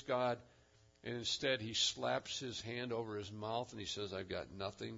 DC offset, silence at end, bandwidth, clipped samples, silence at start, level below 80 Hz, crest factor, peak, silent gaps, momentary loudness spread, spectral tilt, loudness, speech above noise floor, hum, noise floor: under 0.1%; 0 s; 7.4 kHz; under 0.1%; 0 s; -72 dBFS; 18 dB; -22 dBFS; none; 11 LU; -2.5 dB/octave; -40 LUFS; 26 dB; none; -67 dBFS